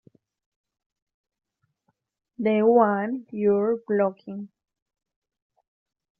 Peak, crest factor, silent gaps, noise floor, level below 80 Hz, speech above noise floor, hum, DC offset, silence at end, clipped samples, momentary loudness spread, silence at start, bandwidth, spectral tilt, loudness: -6 dBFS; 20 dB; none; -75 dBFS; -72 dBFS; 52 dB; none; under 0.1%; 1.75 s; under 0.1%; 19 LU; 2.4 s; 4.5 kHz; -7 dB/octave; -23 LUFS